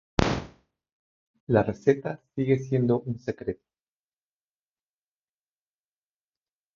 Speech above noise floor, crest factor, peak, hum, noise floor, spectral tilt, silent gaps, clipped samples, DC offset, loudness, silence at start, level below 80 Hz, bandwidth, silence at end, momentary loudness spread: over 64 dB; 30 dB; 0 dBFS; none; under -90 dBFS; -7 dB/octave; 0.92-1.34 s, 1.40-1.47 s; under 0.1%; under 0.1%; -27 LUFS; 0.2 s; -48 dBFS; 7.6 kHz; 3.2 s; 11 LU